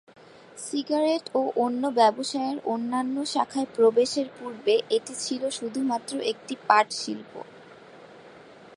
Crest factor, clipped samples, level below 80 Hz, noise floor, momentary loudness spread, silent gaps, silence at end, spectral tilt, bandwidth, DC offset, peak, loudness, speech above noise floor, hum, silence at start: 24 dB; under 0.1%; -78 dBFS; -48 dBFS; 13 LU; none; 0.1 s; -3 dB/octave; 11.5 kHz; under 0.1%; -4 dBFS; -26 LUFS; 23 dB; none; 0.55 s